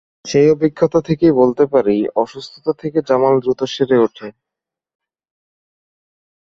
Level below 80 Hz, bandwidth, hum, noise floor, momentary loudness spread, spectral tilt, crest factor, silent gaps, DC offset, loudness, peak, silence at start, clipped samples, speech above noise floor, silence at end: -52 dBFS; 7.6 kHz; none; -85 dBFS; 10 LU; -6.5 dB/octave; 16 dB; none; under 0.1%; -16 LUFS; 0 dBFS; 0.25 s; under 0.1%; 70 dB; 2.2 s